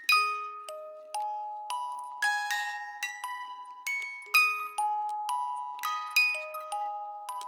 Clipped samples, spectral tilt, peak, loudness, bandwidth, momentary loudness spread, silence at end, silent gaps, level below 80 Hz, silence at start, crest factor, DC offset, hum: under 0.1%; 5.5 dB/octave; -12 dBFS; -30 LUFS; 18 kHz; 14 LU; 0 s; none; under -90 dBFS; 0 s; 20 dB; under 0.1%; none